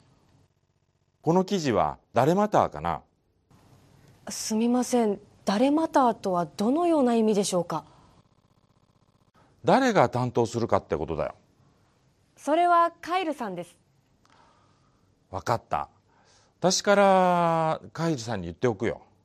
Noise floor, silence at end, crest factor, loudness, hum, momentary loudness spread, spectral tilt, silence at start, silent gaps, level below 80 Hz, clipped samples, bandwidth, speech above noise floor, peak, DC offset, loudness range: -70 dBFS; 0.25 s; 22 dB; -25 LUFS; none; 12 LU; -5 dB/octave; 1.25 s; none; -60 dBFS; under 0.1%; 14.5 kHz; 46 dB; -6 dBFS; under 0.1%; 4 LU